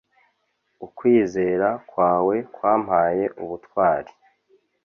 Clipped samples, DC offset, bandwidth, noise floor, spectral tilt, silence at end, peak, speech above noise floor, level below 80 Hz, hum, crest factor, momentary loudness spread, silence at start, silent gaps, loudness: under 0.1%; under 0.1%; 6.8 kHz; -71 dBFS; -8 dB/octave; 0.8 s; -6 dBFS; 50 dB; -58 dBFS; none; 18 dB; 10 LU; 0.8 s; none; -21 LUFS